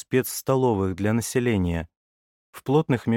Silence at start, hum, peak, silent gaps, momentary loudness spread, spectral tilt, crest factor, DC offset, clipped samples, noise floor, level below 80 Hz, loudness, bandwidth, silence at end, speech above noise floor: 0.1 s; none; -8 dBFS; 1.97-2.53 s; 9 LU; -6 dB/octave; 16 dB; under 0.1%; under 0.1%; under -90 dBFS; -48 dBFS; -24 LUFS; 17 kHz; 0 s; over 67 dB